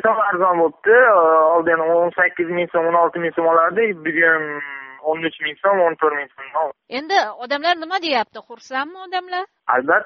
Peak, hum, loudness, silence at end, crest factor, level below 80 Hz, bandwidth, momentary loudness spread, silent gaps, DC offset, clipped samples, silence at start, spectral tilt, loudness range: -2 dBFS; none; -18 LUFS; 0 s; 16 dB; -66 dBFS; 6.6 kHz; 13 LU; none; under 0.1%; under 0.1%; 0.05 s; -1.5 dB/octave; 6 LU